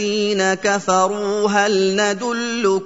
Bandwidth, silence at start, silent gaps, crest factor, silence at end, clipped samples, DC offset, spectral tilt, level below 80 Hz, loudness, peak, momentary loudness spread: 8 kHz; 0 s; none; 16 dB; 0 s; under 0.1%; 0.2%; -3.5 dB/octave; -64 dBFS; -18 LUFS; -2 dBFS; 3 LU